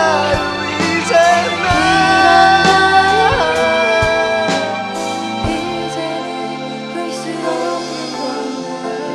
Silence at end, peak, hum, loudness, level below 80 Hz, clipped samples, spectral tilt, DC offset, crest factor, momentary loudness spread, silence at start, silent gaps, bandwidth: 0 s; 0 dBFS; none; -14 LUFS; -38 dBFS; under 0.1%; -3.5 dB/octave; under 0.1%; 14 dB; 13 LU; 0 s; none; 13 kHz